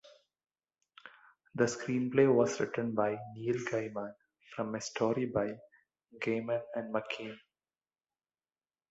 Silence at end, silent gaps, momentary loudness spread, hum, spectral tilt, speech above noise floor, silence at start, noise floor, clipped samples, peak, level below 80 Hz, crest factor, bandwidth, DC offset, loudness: 1.5 s; none; 18 LU; none; -5.5 dB/octave; over 57 dB; 0.05 s; under -90 dBFS; under 0.1%; -14 dBFS; -72 dBFS; 22 dB; 8 kHz; under 0.1%; -33 LUFS